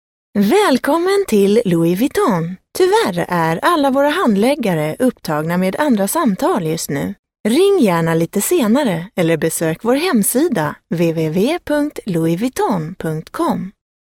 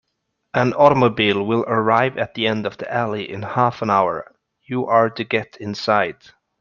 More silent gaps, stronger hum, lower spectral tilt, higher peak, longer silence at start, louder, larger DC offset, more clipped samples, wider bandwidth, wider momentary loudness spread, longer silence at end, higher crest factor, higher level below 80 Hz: first, 7.19-7.23 s, 7.40-7.44 s vs none; neither; about the same, -5.5 dB/octave vs -6.5 dB/octave; about the same, -2 dBFS vs -2 dBFS; second, 0.35 s vs 0.55 s; first, -16 LUFS vs -19 LUFS; neither; neither; first, 17.5 kHz vs 7.2 kHz; second, 8 LU vs 11 LU; second, 0.3 s vs 0.5 s; about the same, 14 dB vs 18 dB; first, -52 dBFS vs -58 dBFS